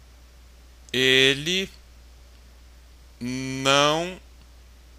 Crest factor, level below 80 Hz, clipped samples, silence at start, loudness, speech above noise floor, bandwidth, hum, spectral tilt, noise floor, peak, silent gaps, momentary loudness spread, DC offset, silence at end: 22 dB; -50 dBFS; under 0.1%; 0.95 s; -21 LUFS; 27 dB; 15.5 kHz; none; -3 dB/octave; -49 dBFS; -4 dBFS; none; 18 LU; under 0.1%; 0.8 s